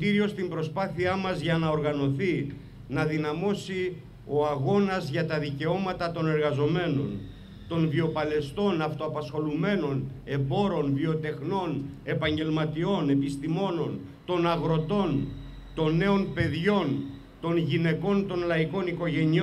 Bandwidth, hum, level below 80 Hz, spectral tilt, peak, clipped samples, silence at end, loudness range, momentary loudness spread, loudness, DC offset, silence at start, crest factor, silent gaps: 11 kHz; none; -52 dBFS; -7.5 dB/octave; -12 dBFS; under 0.1%; 0 s; 2 LU; 8 LU; -28 LUFS; under 0.1%; 0 s; 16 dB; none